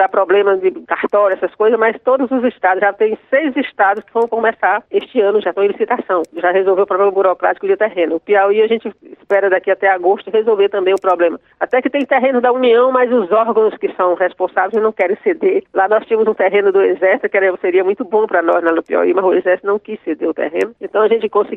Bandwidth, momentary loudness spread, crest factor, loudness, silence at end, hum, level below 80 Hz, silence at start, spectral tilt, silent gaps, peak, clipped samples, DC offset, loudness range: 4 kHz; 5 LU; 14 dB; -14 LUFS; 0 s; none; -66 dBFS; 0 s; -6.5 dB/octave; none; 0 dBFS; under 0.1%; under 0.1%; 2 LU